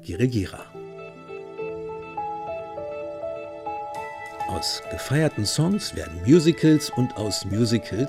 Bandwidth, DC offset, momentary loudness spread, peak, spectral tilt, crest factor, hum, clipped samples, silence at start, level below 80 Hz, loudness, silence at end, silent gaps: 16 kHz; under 0.1%; 17 LU; -4 dBFS; -5.5 dB/octave; 20 dB; none; under 0.1%; 0 s; -54 dBFS; -25 LUFS; 0 s; none